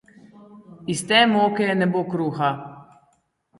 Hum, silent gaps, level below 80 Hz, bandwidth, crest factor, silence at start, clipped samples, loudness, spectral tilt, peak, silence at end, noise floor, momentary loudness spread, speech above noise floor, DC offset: none; none; -66 dBFS; 11.5 kHz; 20 dB; 0.5 s; under 0.1%; -20 LUFS; -4.5 dB/octave; -2 dBFS; 0.75 s; -66 dBFS; 17 LU; 45 dB; under 0.1%